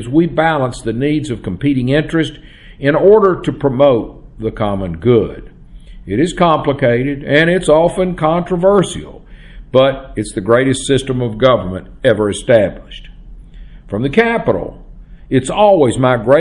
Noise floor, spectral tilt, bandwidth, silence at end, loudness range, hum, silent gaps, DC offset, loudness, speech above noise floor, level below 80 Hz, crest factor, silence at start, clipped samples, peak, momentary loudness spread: -35 dBFS; -6 dB/octave; 11.5 kHz; 0 s; 3 LU; none; none; under 0.1%; -14 LUFS; 22 dB; -36 dBFS; 14 dB; 0 s; under 0.1%; 0 dBFS; 11 LU